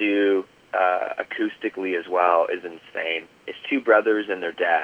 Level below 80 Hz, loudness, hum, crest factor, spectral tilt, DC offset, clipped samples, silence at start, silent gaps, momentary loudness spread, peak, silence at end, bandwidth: -74 dBFS; -23 LUFS; none; 20 dB; -5.5 dB/octave; under 0.1%; under 0.1%; 0 s; none; 11 LU; -4 dBFS; 0 s; 7.8 kHz